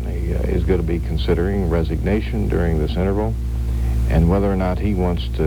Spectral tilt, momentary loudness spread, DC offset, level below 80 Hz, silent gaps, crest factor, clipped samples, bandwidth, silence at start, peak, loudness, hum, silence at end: -8.5 dB/octave; 5 LU; under 0.1%; -22 dBFS; none; 16 dB; under 0.1%; 12 kHz; 0 s; -4 dBFS; -20 LUFS; none; 0 s